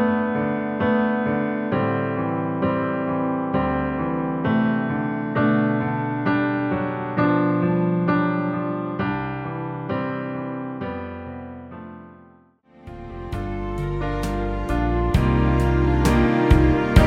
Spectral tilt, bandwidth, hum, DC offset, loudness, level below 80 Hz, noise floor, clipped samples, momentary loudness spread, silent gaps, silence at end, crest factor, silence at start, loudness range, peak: -8 dB/octave; 15.5 kHz; none; under 0.1%; -22 LUFS; -30 dBFS; -53 dBFS; under 0.1%; 12 LU; none; 0 s; 20 dB; 0 s; 10 LU; -2 dBFS